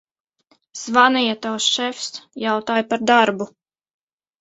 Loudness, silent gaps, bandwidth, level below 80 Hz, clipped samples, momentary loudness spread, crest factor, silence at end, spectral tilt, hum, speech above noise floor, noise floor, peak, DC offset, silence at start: -18 LUFS; none; 8.2 kHz; -68 dBFS; under 0.1%; 15 LU; 20 dB; 0.95 s; -2.5 dB/octave; none; 44 dB; -63 dBFS; 0 dBFS; under 0.1%; 0.75 s